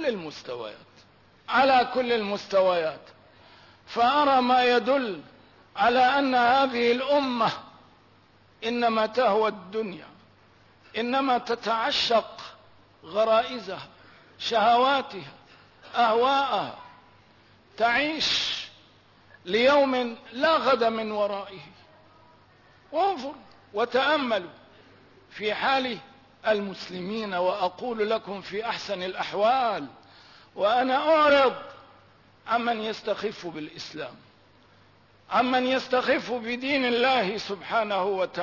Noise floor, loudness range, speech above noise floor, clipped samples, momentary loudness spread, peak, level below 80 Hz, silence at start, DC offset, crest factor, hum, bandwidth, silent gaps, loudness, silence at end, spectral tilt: -58 dBFS; 5 LU; 33 dB; under 0.1%; 17 LU; -10 dBFS; -66 dBFS; 0 s; under 0.1%; 16 dB; none; 6 kHz; none; -25 LUFS; 0 s; -4 dB/octave